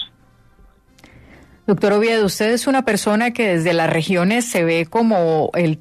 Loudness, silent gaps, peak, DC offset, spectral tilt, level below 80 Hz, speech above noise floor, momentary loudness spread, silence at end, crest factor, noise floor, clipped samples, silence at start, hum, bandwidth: -17 LUFS; none; -4 dBFS; under 0.1%; -5 dB/octave; -54 dBFS; 35 dB; 3 LU; 0.05 s; 14 dB; -52 dBFS; under 0.1%; 0 s; none; 14 kHz